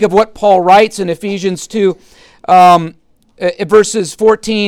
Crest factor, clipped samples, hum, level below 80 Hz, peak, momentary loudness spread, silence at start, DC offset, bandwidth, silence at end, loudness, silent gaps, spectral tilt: 10 dB; under 0.1%; none; -46 dBFS; 0 dBFS; 12 LU; 0 s; under 0.1%; 15.5 kHz; 0 s; -11 LUFS; none; -4.5 dB/octave